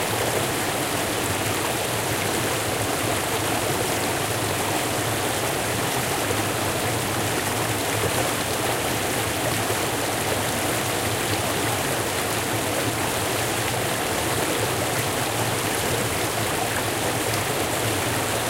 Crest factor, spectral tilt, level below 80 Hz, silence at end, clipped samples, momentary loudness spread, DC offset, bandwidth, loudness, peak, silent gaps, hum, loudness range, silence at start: 16 dB; -3 dB/octave; -46 dBFS; 0 s; under 0.1%; 1 LU; under 0.1%; 16 kHz; -23 LUFS; -8 dBFS; none; none; 0 LU; 0 s